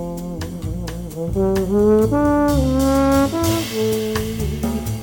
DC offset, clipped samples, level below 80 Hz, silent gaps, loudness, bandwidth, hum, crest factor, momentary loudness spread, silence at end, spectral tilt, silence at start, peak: under 0.1%; under 0.1%; -30 dBFS; none; -19 LUFS; 17.5 kHz; none; 14 dB; 12 LU; 0 s; -6 dB/octave; 0 s; -4 dBFS